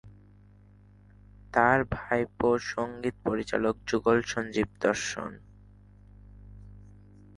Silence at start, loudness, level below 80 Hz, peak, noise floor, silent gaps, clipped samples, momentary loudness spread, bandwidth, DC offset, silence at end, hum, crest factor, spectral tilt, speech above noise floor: 0.05 s; -28 LUFS; -52 dBFS; -6 dBFS; -55 dBFS; none; under 0.1%; 9 LU; 11.5 kHz; under 0.1%; 0.45 s; 50 Hz at -50 dBFS; 24 dB; -5 dB/octave; 28 dB